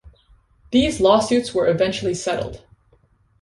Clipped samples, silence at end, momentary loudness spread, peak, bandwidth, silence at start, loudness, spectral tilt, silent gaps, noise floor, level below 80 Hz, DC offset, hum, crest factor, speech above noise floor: under 0.1%; 0.85 s; 9 LU; -2 dBFS; 11.5 kHz; 0.05 s; -19 LUFS; -5 dB/octave; none; -58 dBFS; -44 dBFS; under 0.1%; none; 18 dB; 40 dB